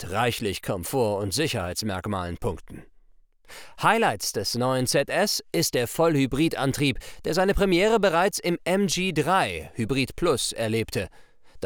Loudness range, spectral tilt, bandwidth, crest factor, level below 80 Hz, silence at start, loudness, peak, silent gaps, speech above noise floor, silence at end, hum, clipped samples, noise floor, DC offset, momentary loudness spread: 5 LU; -4 dB/octave; over 20 kHz; 20 dB; -46 dBFS; 0 s; -24 LUFS; -6 dBFS; none; 31 dB; 0 s; none; under 0.1%; -55 dBFS; under 0.1%; 9 LU